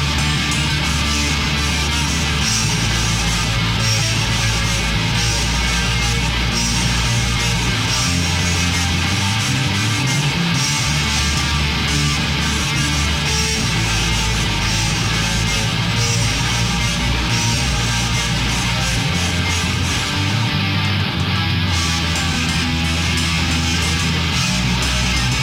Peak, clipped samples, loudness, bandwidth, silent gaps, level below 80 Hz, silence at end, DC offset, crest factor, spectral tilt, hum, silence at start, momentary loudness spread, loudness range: -6 dBFS; under 0.1%; -17 LUFS; 16 kHz; none; -26 dBFS; 0 s; under 0.1%; 12 dB; -3 dB/octave; none; 0 s; 1 LU; 1 LU